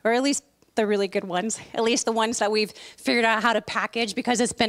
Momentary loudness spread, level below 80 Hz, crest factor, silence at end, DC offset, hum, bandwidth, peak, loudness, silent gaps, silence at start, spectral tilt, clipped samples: 8 LU; -64 dBFS; 18 dB; 0 s; under 0.1%; none; 15.5 kHz; -6 dBFS; -24 LUFS; none; 0.05 s; -2.5 dB/octave; under 0.1%